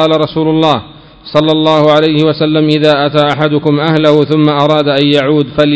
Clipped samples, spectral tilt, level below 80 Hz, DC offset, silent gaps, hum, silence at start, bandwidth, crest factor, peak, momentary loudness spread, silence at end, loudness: 0.8%; -7.5 dB/octave; -44 dBFS; under 0.1%; none; none; 0 s; 8 kHz; 10 dB; 0 dBFS; 3 LU; 0 s; -10 LUFS